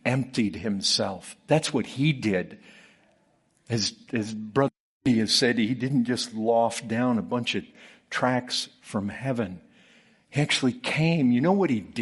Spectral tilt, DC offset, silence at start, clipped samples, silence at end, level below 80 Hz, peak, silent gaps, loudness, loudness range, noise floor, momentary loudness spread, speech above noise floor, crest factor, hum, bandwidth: -5 dB/octave; under 0.1%; 0.05 s; under 0.1%; 0 s; -64 dBFS; -6 dBFS; 4.80-5.00 s; -26 LUFS; 4 LU; -66 dBFS; 10 LU; 41 dB; 20 dB; none; 11.5 kHz